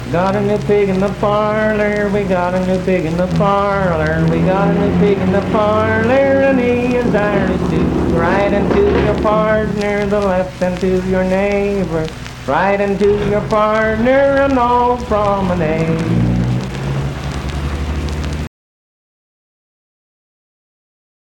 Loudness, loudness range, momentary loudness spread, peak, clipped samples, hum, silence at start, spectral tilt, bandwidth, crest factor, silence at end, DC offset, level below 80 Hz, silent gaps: -15 LUFS; 9 LU; 8 LU; -2 dBFS; under 0.1%; none; 0 s; -7.5 dB/octave; 17 kHz; 12 dB; 2.9 s; under 0.1%; -30 dBFS; none